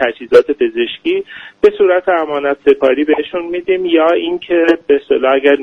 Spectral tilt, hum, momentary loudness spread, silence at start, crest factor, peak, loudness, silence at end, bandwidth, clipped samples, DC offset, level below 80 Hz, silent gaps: -5.5 dB/octave; none; 7 LU; 0 s; 12 dB; 0 dBFS; -13 LUFS; 0 s; 6.6 kHz; 0.3%; under 0.1%; -52 dBFS; none